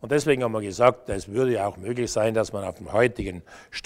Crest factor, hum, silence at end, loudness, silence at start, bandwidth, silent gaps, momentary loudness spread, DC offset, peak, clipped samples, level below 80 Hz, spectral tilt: 22 dB; none; 0.05 s; -24 LUFS; 0 s; 15.5 kHz; none; 12 LU; under 0.1%; -4 dBFS; under 0.1%; -48 dBFS; -5.5 dB/octave